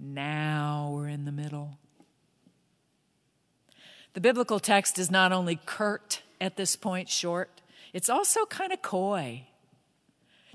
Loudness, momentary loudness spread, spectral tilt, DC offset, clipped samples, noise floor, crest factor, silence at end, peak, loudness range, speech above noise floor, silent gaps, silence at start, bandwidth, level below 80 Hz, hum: -28 LUFS; 14 LU; -3.5 dB/octave; under 0.1%; under 0.1%; -72 dBFS; 24 dB; 1.1 s; -6 dBFS; 10 LU; 44 dB; none; 0 s; 11 kHz; -84 dBFS; none